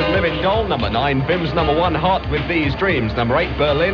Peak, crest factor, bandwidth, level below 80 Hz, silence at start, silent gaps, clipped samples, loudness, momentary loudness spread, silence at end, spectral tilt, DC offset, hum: -4 dBFS; 12 dB; 6.8 kHz; -30 dBFS; 0 s; none; under 0.1%; -18 LUFS; 2 LU; 0 s; -4 dB/octave; under 0.1%; none